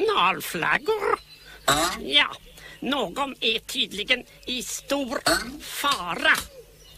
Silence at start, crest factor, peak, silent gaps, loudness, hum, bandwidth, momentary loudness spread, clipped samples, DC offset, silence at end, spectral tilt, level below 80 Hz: 0 s; 20 dB; -6 dBFS; none; -24 LUFS; none; 15.5 kHz; 10 LU; under 0.1%; under 0.1%; 0 s; -2 dB/octave; -52 dBFS